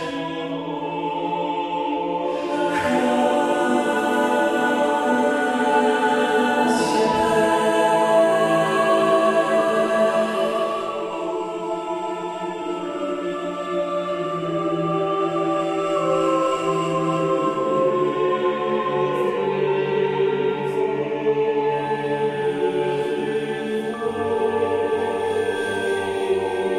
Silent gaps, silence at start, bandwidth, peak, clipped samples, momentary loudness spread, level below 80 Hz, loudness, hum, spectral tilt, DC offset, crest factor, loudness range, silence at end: none; 0 s; 13 kHz; -6 dBFS; under 0.1%; 8 LU; -60 dBFS; -21 LUFS; none; -5 dB/octave; under 0.1%; 16 dB; 6 LU; 0 s